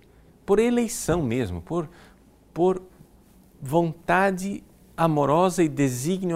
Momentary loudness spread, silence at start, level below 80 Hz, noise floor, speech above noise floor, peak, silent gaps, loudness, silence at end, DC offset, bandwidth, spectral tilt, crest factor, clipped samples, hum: 17 LU; 0.5 s; -50 dBFS; -54 dBFS; 31 dB; -6 dBFS; none; -24 LUFS; 0 s; under 0.1%; 16 kHz; -6 dB/octave; 18 dB; under 0.1%; none